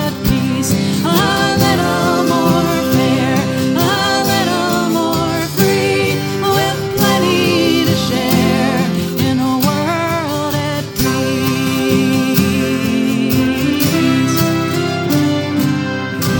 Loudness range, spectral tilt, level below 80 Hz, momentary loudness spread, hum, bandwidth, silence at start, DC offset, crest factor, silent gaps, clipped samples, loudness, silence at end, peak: 2 LU; -5 dB/octave; -38 dBFS; 4 LU; none; 19.5 kHz; 0 s; under 0.1%; 14 dB; none; under 0.1%; -14 LUFS; 0 s; 0 dBFS